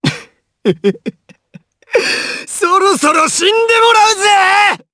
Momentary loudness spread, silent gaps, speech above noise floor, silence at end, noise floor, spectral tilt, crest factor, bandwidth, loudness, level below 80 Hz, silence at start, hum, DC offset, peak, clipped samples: 11 LU; none; 31 dB; 0.15 s; -42 dBFS; -2.5 dB/octave; 12 dB; 11 kHz; -11 LUFS; -56 dBFS; 0 s; none; under 0.1%; 0 dBFS; under 0.1%